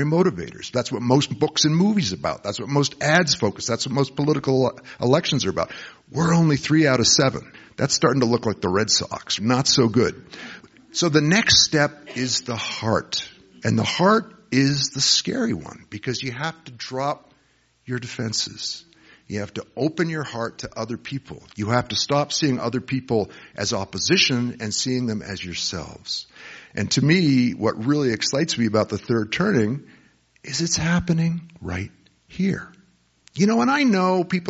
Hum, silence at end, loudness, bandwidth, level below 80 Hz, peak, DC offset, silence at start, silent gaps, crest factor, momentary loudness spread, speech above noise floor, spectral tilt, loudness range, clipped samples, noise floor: none; 0 s; -21 LUFS; 8 kHz; -52 dBFS; -2 dBFS; under 0.1%; 0 s; none; 20 dB; 14 LU; 40 dB; -4 dB/octave; 8 LU; under 0.1%; -62 dBFS